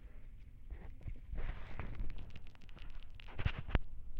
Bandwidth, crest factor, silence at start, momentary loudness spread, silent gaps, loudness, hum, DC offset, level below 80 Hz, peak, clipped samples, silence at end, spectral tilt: 5 kHz; 28 dB; 0 s; 17 LU; none; -47 LUFS; none; under 0.1%; -44 dBFS; -12 dBFS; under 0.1%; 0 s; -7.5 dB/octave